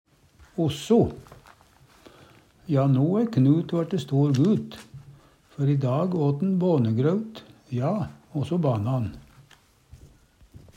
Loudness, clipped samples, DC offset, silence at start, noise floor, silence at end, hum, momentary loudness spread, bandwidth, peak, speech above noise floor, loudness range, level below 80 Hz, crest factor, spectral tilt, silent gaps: -24 LUFS; under 0.1%; under 0.1%; 0.55 s; -57 dBFS; 0.8 s; none; 16 LU; 9.4 kHz; -8 dBFS; 34 dB; 4 LU; -56 dBFS; 16 dB; -8.5 dB/octave; none